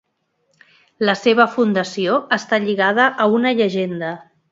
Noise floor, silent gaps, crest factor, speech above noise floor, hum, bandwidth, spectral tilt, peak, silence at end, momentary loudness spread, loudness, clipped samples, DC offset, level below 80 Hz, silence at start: -68 dBFS; none; 18 dB; 51 dB; none; 7.8 kHz; -5 dB/octave; 0 dBFS; 0.3 s; 9 LU; -17 LUFS; under 0.1%; under 0.1%; -68 dBFS; 1 s